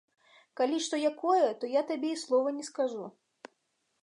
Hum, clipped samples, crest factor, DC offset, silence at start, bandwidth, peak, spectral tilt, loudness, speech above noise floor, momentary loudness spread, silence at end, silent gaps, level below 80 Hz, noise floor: none; under 0.1%; 18 dB; under 0.1%; 0.55 s; 11 kHz; -14 dBFS; -3 dB/octave; -30 LUFS; 48 dB; 9 LU; 0.95 s; none; -90 dBFS; -78 dBFS